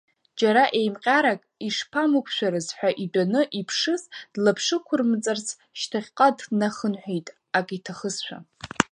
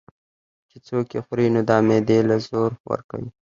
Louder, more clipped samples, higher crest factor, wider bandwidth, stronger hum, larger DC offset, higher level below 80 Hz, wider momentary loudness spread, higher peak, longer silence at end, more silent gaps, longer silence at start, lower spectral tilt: second, -24 LUFS vs -21 LUFS; neither; about the same, 24 dB vs 20 dB; first, 11.5 kHz vs 7.4 kHz; neither; neither; second, -66 dBFS vs -58 dBFS; about the same, 12 LU vs 11 LU; about the same, 0 dBFS vs -2 dBFS; second, 0.05 s vs 0.3 s; second, none vs 2.80-2.84 s, 3.04-3.09 s; second, 0.35 s vs 0.75 s; second, -4 dB/octave vs -7.5 dB/octave